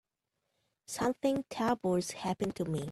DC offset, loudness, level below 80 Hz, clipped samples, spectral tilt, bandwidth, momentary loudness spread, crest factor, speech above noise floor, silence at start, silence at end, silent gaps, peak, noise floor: under 0.1%; -34 LUFS; -66 dBFS; under 0.1%; -5.5 dB/octave; 13.5 kHz; 5 LU; 16 dB; 52 dB; 0.9 s; 0 s; none; -18 dBFS; -85 dBFS